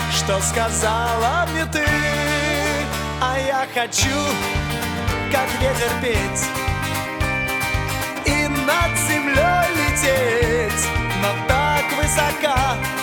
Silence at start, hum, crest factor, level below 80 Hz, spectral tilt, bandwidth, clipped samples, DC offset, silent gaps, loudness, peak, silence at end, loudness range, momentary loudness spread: 0 s; none; 18 dB; -32 dBFS; -3.5 dB/octave; over 20 kHz; under 0.1%; under 0.1%; none; -19 LUFS; -2 dBFS; 0 s; 3 LU; 5 LU